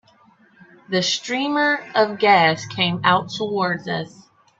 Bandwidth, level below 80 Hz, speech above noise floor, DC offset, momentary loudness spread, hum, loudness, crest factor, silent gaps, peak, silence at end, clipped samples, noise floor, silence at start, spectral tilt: 8 kHz; -64 dBFS; 35 dB; under 0.1%; 10 LU; none; -19 LUFS; 20 dB; none; 0 dBFS; 0.5 s; under 0.1%; -55 dBFS; 0.9 s; -4 dB/octave